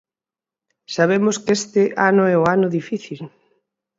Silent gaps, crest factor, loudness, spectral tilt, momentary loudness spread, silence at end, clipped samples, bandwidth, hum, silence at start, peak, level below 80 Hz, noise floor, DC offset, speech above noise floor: none; 18 dB; -18 LUFS; -5.5 dB/octave; 16 LU; 0.7 s; under 0.1%; 7.8 kHz; none; 0.9 s; -2 dBFS; -62 dBFS; under -90 dBFS; under 0.1%; over 72 dB